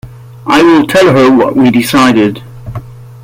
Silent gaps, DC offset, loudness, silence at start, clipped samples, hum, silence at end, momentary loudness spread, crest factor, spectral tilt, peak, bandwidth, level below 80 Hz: none; under 0.1%; -7 LUFS; 0.05 s; under 0.1%; none; 0.1 s; 19 LU; 8 dB; -5.5 dB/octave; 0 dBFS; 16.5 kHz; -40 dBFS